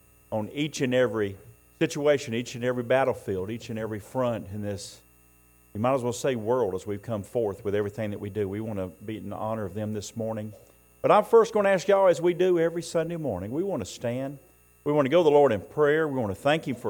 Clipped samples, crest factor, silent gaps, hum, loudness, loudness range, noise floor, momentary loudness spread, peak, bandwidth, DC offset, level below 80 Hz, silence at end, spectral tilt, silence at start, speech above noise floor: under 0.1%; 18 dB; none; none; -26 LUFS; 8 LU; -58 dBFS; 13 LU; -8 dBFS; 17 kHz; under 0.1%; -62 dBFS; 0 s; -6 dB/octave; 0.3 s; 33 dB